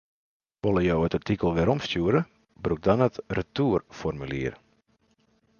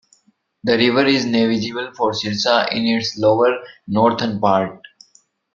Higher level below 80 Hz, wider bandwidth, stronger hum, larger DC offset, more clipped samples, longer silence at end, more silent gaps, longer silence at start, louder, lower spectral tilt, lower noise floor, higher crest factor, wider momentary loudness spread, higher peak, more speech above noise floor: first, -46 dBFS vs -58 dBFS; about the same, 7 kHz vs 7.6 kHz; neither; neither; neither; first, 1.05 s vs 0.75 s; neither; about the same, 0.65 s vs 0.65 s; second, -26 LUFS vs -18 LUFS; first, -7.5 dB/octave vs -5 dB/octave; first, -67 dBFS vs -60 dBFS; about the same, 20 dB vs 18 dB; about the same, 9 LU vs 8 LU; second, -8 dBFS vs 0 dBFS; about the same, 42 dB vs 43 dB